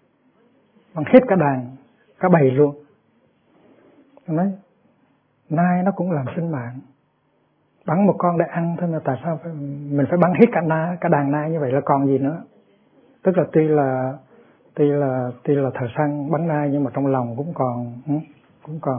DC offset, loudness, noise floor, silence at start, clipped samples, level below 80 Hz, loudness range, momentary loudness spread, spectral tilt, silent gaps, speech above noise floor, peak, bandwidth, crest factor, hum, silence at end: under 0.1%; -20 LUFS; -64 dBFS; 0.95 s; under 0.1%; -66 dBFS; 5 LU; 14 LU; -12.5 dB/octave; none; 45 dB; 0 dBFS; 3.6 kHz; 20 dB; none; 0 s